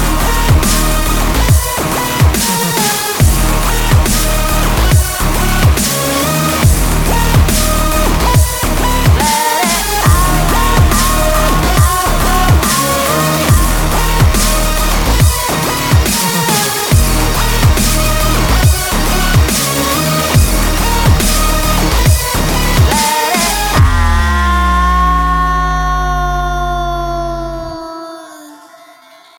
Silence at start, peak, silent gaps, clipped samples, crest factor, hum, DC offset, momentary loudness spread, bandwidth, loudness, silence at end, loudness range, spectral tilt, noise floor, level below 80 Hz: 0 s; 0 dBFS; none; under 0.1%; 10 dB; none; under 0.1%; 4 LU; 19.5 kHz; -12 LUFS; 0.8 s; 1 LU; -4 dB/octave; -40 dBFS; -16 dBFS